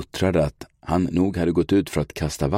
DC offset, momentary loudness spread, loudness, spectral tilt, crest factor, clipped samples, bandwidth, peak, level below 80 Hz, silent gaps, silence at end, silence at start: under 0.1%; 7 LU; -23 LUFS; -6.5 dB/octave; 14 dB; under 0.1%; 16.5 kHz; -8 dBFS; -40 dBFS; none; 0 s; 0 s